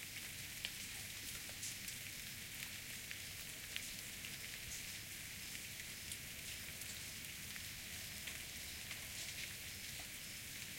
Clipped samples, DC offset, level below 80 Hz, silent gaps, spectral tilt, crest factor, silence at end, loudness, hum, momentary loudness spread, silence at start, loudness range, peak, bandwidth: under 0.1%; under 0.1%; -66 dBFS; none; -1 dB/octave; 28 dB; 0 s; -46 LUFS; none; 2 LU; 0 s; 1 LU; -22 dBFS; 17 kHz